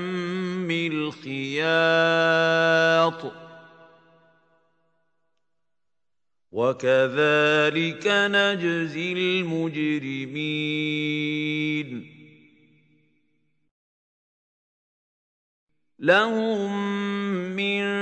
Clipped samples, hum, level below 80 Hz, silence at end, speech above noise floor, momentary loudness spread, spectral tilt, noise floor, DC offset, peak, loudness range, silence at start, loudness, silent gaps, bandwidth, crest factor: under 0.1%; none; -76 dBFS; 0 s; 65 dB; 9 LU; -5.5 dB/octave; -88 dBFS; under 0.1%; -4 dBFS; 10 LU; 0 s; -23 LUFS; 13.71-15.67 s; 9 kHz; 20 dB